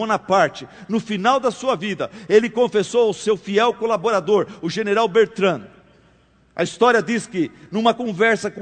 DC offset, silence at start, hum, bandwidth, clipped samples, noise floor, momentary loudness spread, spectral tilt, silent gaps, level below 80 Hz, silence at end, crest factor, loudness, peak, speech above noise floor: under 0.1%; 0 s; none; 9.4 kHz; under 0.1%; -55 dBFS; 9 LU; -4.5 dB/octave; none; -62 dBFS; 0 s; 18 dB; -19 LUFS; -2 dBFS; 36 dB